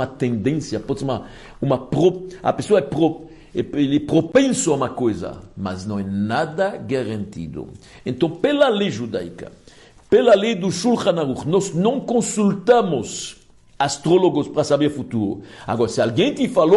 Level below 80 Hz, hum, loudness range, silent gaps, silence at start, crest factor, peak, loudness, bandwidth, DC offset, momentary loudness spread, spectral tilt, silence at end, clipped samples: -52 dBFS; none; 4 LU; none; 0 s; 16 dB; -4 dBFS; -20 LUFS; 11.5 kHz; under 0.1%; 13 LU; -5.5 dB/octave; 0 s; under 0.1%